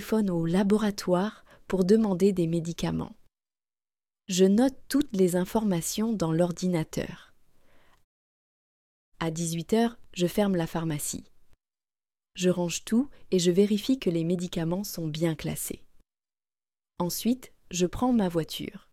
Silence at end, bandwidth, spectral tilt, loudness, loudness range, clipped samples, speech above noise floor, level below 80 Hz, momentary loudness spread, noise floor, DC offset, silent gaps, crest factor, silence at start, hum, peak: 0.15 s; 16.5 kHz; -5.5 dB/octave; -27 LUFS; 6 LU; under 0.1%; over 64 dB; -54 dBFS; 11 LU; under -90 dBFS; under 0.1%; 8.04-9.12 s; 18 dB; 0 s; none; -10 dBFS